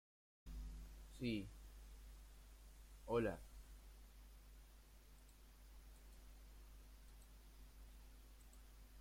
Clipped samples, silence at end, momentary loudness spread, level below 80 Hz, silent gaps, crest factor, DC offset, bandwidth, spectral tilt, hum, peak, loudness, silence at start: under 0.1%; 0 s; 20 LU; -60 dBFS; none; 24 dB; under 0.1%; 16.5 kHz; -6 dB/octave; none; -30 dBFS; -50 LUFS; 0.45 s